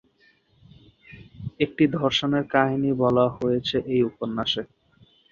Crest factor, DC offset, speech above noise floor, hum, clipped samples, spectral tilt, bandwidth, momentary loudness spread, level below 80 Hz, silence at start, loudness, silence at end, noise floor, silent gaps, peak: 22 dB; under 0.1%; 39 dB; none; under 0.1%; -6.5 dB/octave; 7.4 kHz; 8 LU; -56 dBFS; 1.1 s; -23 LUFS; 0.65 s; -62 dBFS; none; -4 dBFS